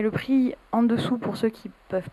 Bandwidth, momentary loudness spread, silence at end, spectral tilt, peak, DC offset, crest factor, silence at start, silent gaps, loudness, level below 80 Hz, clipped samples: 13 kHz; 9 LU; 0.05 s; -7.5 dB/octave; -10 dBFS; under 0.1%; 14 dB; 0 s; none; -25 LUFS; -58 dBFS; under 0.1%